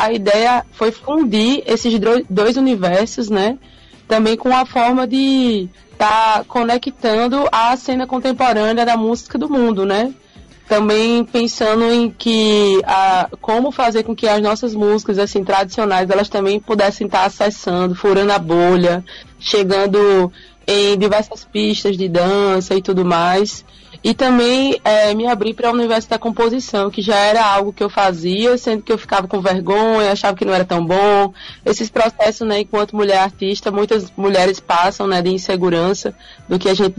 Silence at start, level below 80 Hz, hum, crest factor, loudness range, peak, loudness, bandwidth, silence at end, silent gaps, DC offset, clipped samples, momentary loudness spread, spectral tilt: 0 s; -48 dBFS; none; 10 dB; 2 LU; -6 dBFS; -15 LUFS; 11 kHz; 0.05 s; none; under 0.1%; under 0.1%; 6 LU; -5 dB/octave